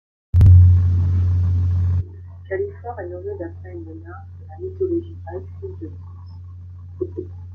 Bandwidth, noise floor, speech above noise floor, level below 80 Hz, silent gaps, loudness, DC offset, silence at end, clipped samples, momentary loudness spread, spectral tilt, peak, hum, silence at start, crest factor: 2.2 kHz; -36 dBFS; 7 dB; -34 dBFS; none; -18 LUFS; under 0.1%; 0 s; under 0.1%; 25 LU; -11 dB/octave; -2 dBFS; none; 0.35 s; 16 dB